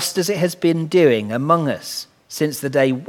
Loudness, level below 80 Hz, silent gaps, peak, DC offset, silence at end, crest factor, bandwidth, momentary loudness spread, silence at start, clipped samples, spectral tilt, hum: -19 LUFS; -66 dBFS; none; 0 dBFS; under 0.1%; 0 s; 18 dB; 18.5 kHz; 12 LU; 0 s; under 0.1%; -5 dB/octave; none